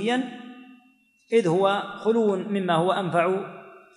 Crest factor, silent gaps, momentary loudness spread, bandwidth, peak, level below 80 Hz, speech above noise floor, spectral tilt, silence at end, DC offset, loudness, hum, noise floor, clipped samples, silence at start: 18 dB; none; 17 LU; 11 kHz; -8 dBFS; -76 dBFS; 38 dB; -6.5 dB/octave; 0.2 s; under 0.1%; -24 LUFS; none; -61 dBFS; under 0.1%; 0 s